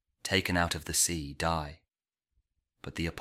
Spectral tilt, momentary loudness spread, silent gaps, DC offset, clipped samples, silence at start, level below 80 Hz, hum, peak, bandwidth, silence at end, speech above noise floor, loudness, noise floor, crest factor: -3 dB/octave; 15 LU; none; under 0.1%; under 0.1%; 0.25 s; -50 dBFS; none; -12 dBFS; 16.5 kHz; 0 s; over 59 dB; -30 LUFS; under -90 dBFS; 22 dB